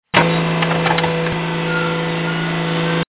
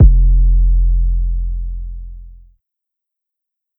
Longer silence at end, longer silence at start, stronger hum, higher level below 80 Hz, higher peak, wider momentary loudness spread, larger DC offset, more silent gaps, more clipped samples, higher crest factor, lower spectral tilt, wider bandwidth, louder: second, 0.1 s vs 1.5 s; first, 0.15 s vs 0 s; neither; second, -46 dBFS vs -14 dBFS; about the same, 0 dBFS vs 0 dBFS; second, 4 LU vs 17 LU; first, 0.2% vs under 0.1%; neither; neither; about the same, 18 dB vs 14 dB; second, -10 dB/octave vs -14.5 dB/octave; first, 4 kHz vs 0.6 kHz; about the same, -18 LUFS vs -17 LUFS